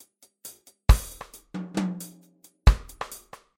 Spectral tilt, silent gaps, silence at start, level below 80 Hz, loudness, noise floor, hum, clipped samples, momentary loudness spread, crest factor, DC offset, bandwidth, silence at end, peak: -5.5 dB/octave; none; 0.45 s; -28 dBFS; -27 LUFS; -57 dBFS; none; under 0.1%; 21 LU; 22 dB; under 0.1%; 16.5 kHz; 0.4 s; -4 dBFS